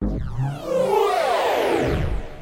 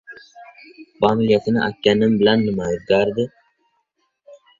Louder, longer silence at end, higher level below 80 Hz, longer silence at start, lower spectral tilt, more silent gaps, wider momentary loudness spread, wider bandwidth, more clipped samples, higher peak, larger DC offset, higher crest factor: second, -22 LUFS vs -18 LUFS; second, 0 s vs 0.25 s; first, -32 dBFS vs -52 dBFS; about the same, 0 s vs 0.1 s; about the same, -6 dB/octave vs -6.5 dB/octave; neither; about the same, 8 LU vs 7 LU; first, 16 kHz vs 7.4 kHz; neither; second, -8 dBFS vs -2 dBFS; neither; about the same, 14 dB vs 18 dB